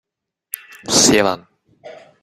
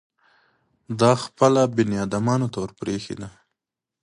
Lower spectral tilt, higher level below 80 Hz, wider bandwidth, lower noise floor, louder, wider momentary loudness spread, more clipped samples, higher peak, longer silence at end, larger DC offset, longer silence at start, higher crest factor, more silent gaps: second, -2 dB/octave vs -6 dB/octave; about the same, -52 dBFS vs -56 dBFS; first, 16 kHz vs 11.5 kHz; second, -65 dBFS vs -87 dBFS; first, -14 LUFS vs -22 LUFS; first, 20 LU vs 16 LU; neither; first, 0 dBFS vs -4 dBFS; second, 0.3 s vs 0.75 s; neither; about the same, 0.85 s vs 0.9 s; about the same, 20 dB vs 20 dB; neither